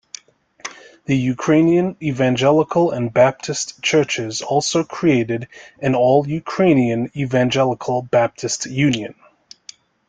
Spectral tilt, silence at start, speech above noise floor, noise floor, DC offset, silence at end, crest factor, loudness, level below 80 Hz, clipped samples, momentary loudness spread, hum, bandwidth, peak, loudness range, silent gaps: -5 dB/octave; 0.65 s; 29 dB; -46 dBFS; under 0.1%; 0.95 s; 16 dB; -18 LUFS; -56 dBFS; under 0.1%; 12 LU; none; 9.4 kHz; -2 dBFS; 2 LU; none